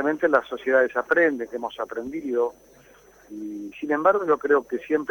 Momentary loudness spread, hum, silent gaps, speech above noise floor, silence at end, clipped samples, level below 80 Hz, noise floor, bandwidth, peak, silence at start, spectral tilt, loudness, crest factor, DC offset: 14 LU; none; none; 29 dB; 0 s; under 0.1%; -64 dBFS; -53 dBFS; 19.5 kHz; -6 dBFS; 0 s; -5.5 dB/octave; -23 LUFS; 18 dB; under 0.1%